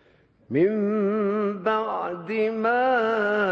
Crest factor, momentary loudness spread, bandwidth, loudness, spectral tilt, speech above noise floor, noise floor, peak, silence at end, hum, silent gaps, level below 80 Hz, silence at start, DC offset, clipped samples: 12 dB; 7 LU; 6.4 kHz; -24 LUFS; -8 dB/octave; 35 dB; -58 dBFS; -10 dBFS; 0 s; none; none; -66 dBFS; 0.5 s; under 0.1%; under 0.1%